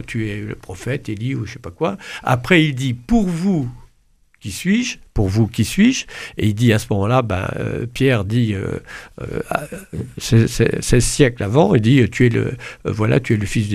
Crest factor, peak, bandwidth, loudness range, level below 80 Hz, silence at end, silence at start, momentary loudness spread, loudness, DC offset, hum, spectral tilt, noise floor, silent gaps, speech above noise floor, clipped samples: 18 dB; 0 dBFS; 15.5 kHz; 4 LU; -36 dBFS; 0 s; 0 s; 14 LU; -18 LUFS; under 0.1%; none; -6 dB/octave; -56 dBFS; none; 39 dB; under 0.1%